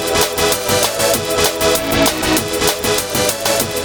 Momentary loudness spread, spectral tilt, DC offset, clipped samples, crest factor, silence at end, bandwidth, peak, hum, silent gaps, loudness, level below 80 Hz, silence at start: 2 LU; -2.5 dB/octave; under 0.1%; under 0.1%; 16 dB; 0 s; over 20 kHz; 0 dBFS; none; none; -15 LUFS; -36 dBFS; 0 s